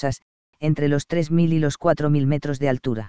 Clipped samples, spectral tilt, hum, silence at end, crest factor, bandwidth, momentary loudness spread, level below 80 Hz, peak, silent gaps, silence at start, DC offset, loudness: under 0.1%; -7.5 dB/octave; none; 0 s; 18 dB; 8 kHz; 7 LU; -48 dBFS; -4 dBFS; 0.22-0.53 s; 0 s; 2%; -22 LUFS